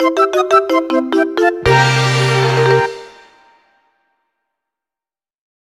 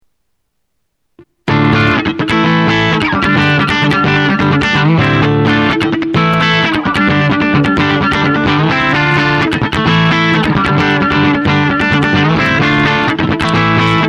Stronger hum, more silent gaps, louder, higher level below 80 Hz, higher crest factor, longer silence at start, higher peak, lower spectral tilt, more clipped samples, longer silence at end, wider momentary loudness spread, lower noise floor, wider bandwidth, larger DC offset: neither; neither; about the same, -13 LUFS vs -11 LUFS; second, -42 dBFS vs -34 dBFS; about the same, 16 dB vs 12 dB; second, 0 s vs 1.45 s; about the same, 0 dBFS vs 0 dBFS; about the same, -5.5 dB/octave vs -6.5 dB/octave; neither; first, 2.65 s vs 0 s; about the same, 4 LU vs 2 LU; first, under -90 dBFS vs -69 dBFS; first, 13.5 kHz vs 10.5 kHz; neither